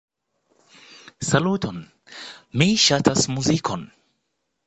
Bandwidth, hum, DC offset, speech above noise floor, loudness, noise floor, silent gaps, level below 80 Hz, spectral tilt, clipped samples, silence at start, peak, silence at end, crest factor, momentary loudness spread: 9 kHz; none; under 0.1%; 55 dB; -20 LUFS; -76 dBFS; none; -52 dBFS; -4 dB/octave; under 0.1%; 1.2 s; -2 dBFS; 0.8 s; 22 dB; 22 LU